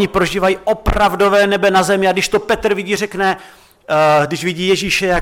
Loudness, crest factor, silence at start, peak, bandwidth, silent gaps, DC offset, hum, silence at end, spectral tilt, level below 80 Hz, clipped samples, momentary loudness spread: -15 LUFS; 12 dB; 0 s; -2 dBFS; 17 kHz; none; under 0.1%; none; 0 s; -4.5 dB/octave; -32 dBFS; under 0.1%; 6 LU